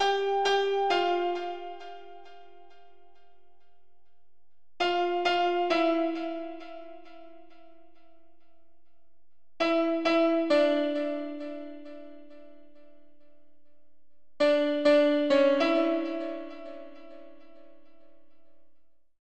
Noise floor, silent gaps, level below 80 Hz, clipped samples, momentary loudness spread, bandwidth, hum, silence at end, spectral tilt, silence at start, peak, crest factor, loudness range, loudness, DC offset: -79 dBFS; none; -74 dBFS; under 0.1%; 22 LU; 8.8 kHz; none; 0 s; -3.5 dB/octave; 0 s; -12 dBFS; 18 dB; 14 LU; -26 LUFS; 0.6%